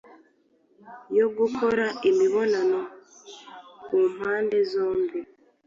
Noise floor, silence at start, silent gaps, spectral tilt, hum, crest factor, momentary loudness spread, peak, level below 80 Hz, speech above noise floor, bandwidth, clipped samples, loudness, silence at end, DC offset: -64 dBFS; 0.85 s; none; -5 dB/octave; none; 14 dB; 22 LU; -12 dBFS; -68 dBFS; 40 dB; 7.4 kHz; under 0.1%; -24 LUFS; 0.4 s; under 0.1%